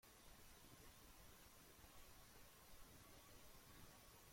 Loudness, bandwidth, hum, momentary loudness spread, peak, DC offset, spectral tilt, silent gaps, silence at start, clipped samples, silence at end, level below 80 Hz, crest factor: -65 LUFS; 16.5 kHz; none; 1 LU; -48 dBFS; under 0.1%; -3 dB/octave; none; 0.05 s; under 0.1%; 0 s; -72 dBFS; 16 dB